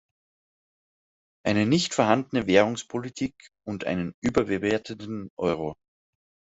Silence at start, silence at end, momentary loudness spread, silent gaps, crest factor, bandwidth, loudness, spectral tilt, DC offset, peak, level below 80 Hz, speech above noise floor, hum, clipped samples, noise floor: 1.45 s; 0.75 s; 14 LU; 4.14-4.22 s, 5.30-5.37 s; 24 dB; 8.2 kHz; -26 LUFS; -5 dB/octave; under 0.1%; -4 dBFS; -58 dBFS; over 65 dB; none; under 0.1%; under -90 dBFS